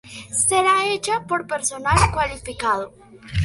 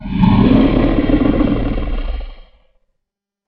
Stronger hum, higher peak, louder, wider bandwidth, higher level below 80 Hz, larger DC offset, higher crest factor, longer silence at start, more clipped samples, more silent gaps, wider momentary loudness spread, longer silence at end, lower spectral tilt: neither; about the same, -2 dBFS vs 0 dBFS; second, -20 LUFS vs -14 LUFS; first, 11.5 kHz vs 5.2 kHz; second, -36 dBFS vs -22 dBFS; neither; about the same, 18 dB vs 14 dB; about the same, 0.05 s vs 0 s; neither; neither; second, 9 LU vs 15 LU; second, 0 s vs 1.05 s; second, -3 dB/octave vs -10.5 dB/octave